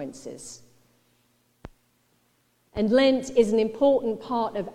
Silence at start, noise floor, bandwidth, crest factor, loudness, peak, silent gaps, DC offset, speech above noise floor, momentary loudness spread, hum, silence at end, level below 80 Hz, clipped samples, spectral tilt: 0 s; -67 dBFS; 12 kHz; 18 dB; -23 LUFS; -8 dBFS; none; under 0.1%; 44 dB; 19 LU; none; 0 s; -56 dBFS; under 0.1%; -5 dB/octave